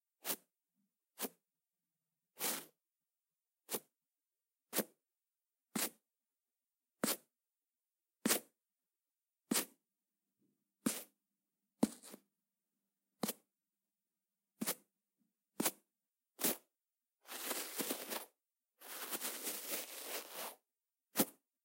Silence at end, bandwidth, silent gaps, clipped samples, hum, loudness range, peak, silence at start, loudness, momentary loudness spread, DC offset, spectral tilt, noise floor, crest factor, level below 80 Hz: 0.3 s; 16 kHz; none; under 0.1%; none; 5 LU; -18 dBFS; 0.25 s; -41 LUFS; 12 LU; under 0.1%; -2 dB/octave; under -90 dBFS; 30 dB; under -90 dBFS